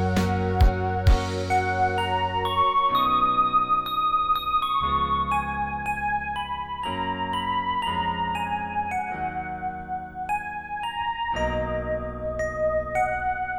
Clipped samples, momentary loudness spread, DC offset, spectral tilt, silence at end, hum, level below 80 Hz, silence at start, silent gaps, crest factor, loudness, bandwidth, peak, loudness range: under 0.1%; 9 LU; under 0.1%; -6 dB/octave; 0 s; none; -34 dBFS; 0 s; none; 16 dB; -25 LUFS; 16.5 kHz; -8 dBFS; 7 LU